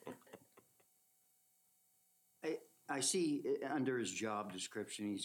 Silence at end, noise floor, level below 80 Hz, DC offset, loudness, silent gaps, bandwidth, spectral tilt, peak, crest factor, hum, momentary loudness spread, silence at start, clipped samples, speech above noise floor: 0 s; -76 dBFS; under -90 dBFS; under 0.1%; -40 LUFS; none; 19 kHz; -3 dB/octave; -24 dBFS; 18 dB; 60 Hz at -75 dBFS; 12 LU; 0.05 s; under 0.1%; 36 dB